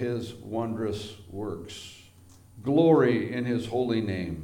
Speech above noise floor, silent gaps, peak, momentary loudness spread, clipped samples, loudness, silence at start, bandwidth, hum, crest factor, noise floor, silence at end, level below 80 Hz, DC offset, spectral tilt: 26 dB; none; -8 dBFS; 18 LU; under 0.1%; -27 LUFS; 0 s; 16.5 kHz; none; 18 dB; -53 dBFS; 0 s; -58 dBFS; under 0.1%; -7 dB/octave